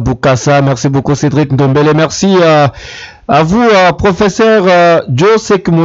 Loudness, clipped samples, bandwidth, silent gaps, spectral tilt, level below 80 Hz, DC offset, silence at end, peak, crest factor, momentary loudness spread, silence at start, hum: -8 LUFS; under 0.1%; 7.8 kHz; none; -6 dB/octave; -34 dBFS; under 0.1%; 0 s; 0 dBFS; 8 dB; 5 LU; 0 s; none